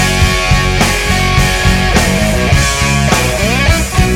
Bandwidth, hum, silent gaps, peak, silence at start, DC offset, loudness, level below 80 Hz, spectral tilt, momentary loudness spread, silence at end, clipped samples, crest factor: 17 kHz; none; none; 0 dBFS; 0 s; under 0.1%; -11 LUFS; -16 dBFS; -4 dB/octave; 1 LU; 0 s; under 0.1%; 10 dB